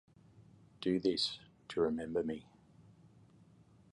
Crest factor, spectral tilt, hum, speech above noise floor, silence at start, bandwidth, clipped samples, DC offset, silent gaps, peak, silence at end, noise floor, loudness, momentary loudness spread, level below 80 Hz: 20 dB; -5.5 dB/octave; none; 28 dB; 0.4 s; 11 kHz; under 0.1%; under 0.1%; none; -20 dBFS; 1.1 s; -64 dBFS; -36 LUFS; 11 LU; -68 dBFS